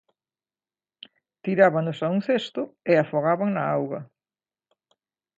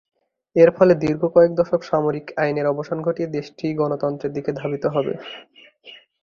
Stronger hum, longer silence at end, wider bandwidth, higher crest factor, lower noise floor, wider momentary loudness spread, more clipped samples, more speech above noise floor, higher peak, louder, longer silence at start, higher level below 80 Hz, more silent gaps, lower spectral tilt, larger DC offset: neither; first, 1.35 s vs 0.25 s; first, 7.8 kHz vs 6.8 kHz; about the same, 22 dB vs 18 dB; first, under -90 dBFS vs -46 dBFS; about the same, 12 LU vs 11 LU; neither; first, over 67 dB vs 27 dB; about the same, -4 dBFS vs -2 dBFS; second, -24 LUFS vs -20 LUFS; first, 1.45 s vs 0.55 s; second, -74 dBFS vs -58 dBFS; neither; about the same, -7.5 dB/octave vs -8 dB/octave; neither